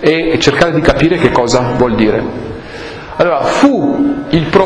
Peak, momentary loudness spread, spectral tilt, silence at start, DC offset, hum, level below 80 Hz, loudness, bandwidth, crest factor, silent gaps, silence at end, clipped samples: 0 dBFS; 14 LU; -5.5 dB/octave; 0 s; under 0.1%; none; -30 dBFS; -11 LUFS; 11 kHz; 12 dB; none; 0 s; 0.6%